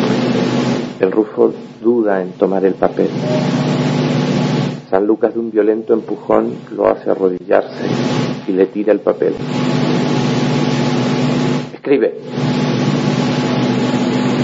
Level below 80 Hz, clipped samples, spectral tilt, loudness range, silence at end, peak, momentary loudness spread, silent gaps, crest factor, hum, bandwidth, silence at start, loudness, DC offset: -52 dBFS; under 0.1%; -7 dB/octave; 1 LU; 0 s; 0 dBFS; 3 LU; none; 16 dB; none; 7.8 kHz; 0 s; -16 LUFS; under 0.1%